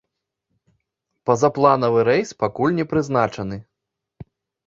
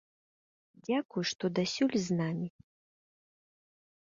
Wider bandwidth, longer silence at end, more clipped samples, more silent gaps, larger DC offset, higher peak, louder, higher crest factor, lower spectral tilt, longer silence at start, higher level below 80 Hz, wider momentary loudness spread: about the same, 7.8 kHz vs 7.6 kHz; second, 0.45 s vs 1.65 s; neither; second, none vs 1.05-1.09 s, 1.35-1.39 s; neither; first, -2 dBFS vs -18 dBFS; first, -19 LUFS vs -33 LUFS; about the same, 20 dB vs 18 dB; first, -6.5 dB/octave vs -5 dB/octave; first, 1.25 s vs 0.9 s; first, -54 dBFS vs -74 dBFS; first, 13 LU vs 9 LU